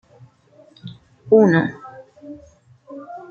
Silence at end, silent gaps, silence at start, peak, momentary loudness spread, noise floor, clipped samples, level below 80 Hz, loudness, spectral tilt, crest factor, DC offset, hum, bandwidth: 0.15 s; none; 0.85 s; -2 dBFS; 27 LU; -52 dBFS; under 0.1%; -62 dBFS; -16 LUFS; -8.5 dB/octave; 20 dB; under 0.1%; none; 6.8 kHz